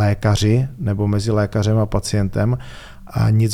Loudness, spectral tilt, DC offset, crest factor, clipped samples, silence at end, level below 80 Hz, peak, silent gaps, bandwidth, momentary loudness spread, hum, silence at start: -19 LUFS; -6.5 dB/octave; under 0.1%; 14 dB; under 0.1%; 0 s; -36 dBFS; -4 dBFS; none; 13.5 kHz; 9 LU; none; 0 s